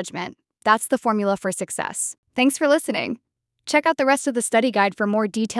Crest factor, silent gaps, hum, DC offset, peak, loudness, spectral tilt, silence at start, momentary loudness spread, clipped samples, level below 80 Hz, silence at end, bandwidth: 20 dB; 2.18-2.23 s; none; under 0.1%; -2 dBFS; -21 LUFS; -3.5 dB/octave; 0 s; 11 LU; under 0.1%; -70 dBFS; 0 s; 12 kHz